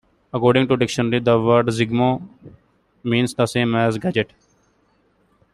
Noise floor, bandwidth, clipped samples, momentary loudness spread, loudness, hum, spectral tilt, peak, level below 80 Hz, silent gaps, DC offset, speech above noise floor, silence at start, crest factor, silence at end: -62 dBFS; 12.5 kHz; under 0.1%; 9 LU; -19 LUFS; none; -6 dB/octave; -2 dBFS; -54 dBFS; none; under 0.1%; 43 dB; 0.35 s; 18 dB; 1.3 s